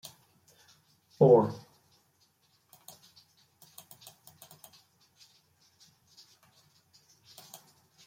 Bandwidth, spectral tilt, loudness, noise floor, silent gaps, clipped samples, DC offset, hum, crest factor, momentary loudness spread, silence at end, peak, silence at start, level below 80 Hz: 16.5 kHz; -7.5 dB/octave; -24 LUFS; -70 dBFS; none; under 0.1%; under 0.1%; none; 26 dB; 32 LU; 6.5 s; -8 dBFS; 1.2 s; -78 dBFS